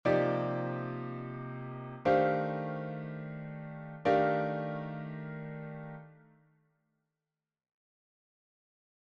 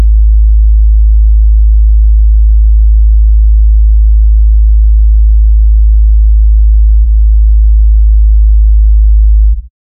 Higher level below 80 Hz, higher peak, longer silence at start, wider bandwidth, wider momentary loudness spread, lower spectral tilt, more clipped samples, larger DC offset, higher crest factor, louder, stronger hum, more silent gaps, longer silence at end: second, -70 dBFS vs -4 dBFS; second, -16 dBFS vs 0 dBFS; about the same, 0.05 s vs 0 s; first, 7.2 kHz vs 0.2 kHz; first, 15 LU vs 0 LU; second, -8.5 dB/octave vs -17.5 dB/octave; neither; neither; first, 20 dB vs 4 dB; second, -34 LUFS vs -8 LUFS; neither; neither; first, 2.9 s vs 0.35 s